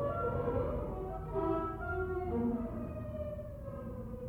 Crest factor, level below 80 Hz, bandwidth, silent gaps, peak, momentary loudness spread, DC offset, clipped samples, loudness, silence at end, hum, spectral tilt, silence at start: 16 dB; -46 dBFS; 17 kHz; none; -22 dBFS; 9 LU; under 0.1%; under 0.1%; -38 LUFS; 0 s; none; -10 dB/octave; 0 s